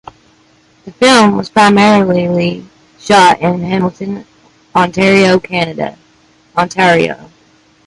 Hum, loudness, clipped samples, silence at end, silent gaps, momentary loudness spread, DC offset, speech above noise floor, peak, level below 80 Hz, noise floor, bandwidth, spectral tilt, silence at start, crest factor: none; -10 LUFS; under 0.1%; 0.6 s; none; 16 LU; under 0.1%; 39 dB; 0 dBFS; -48 dBFS; -49 dBFS; 11.5 kHz; -5 dB/octave; 0.85 s; 12 dB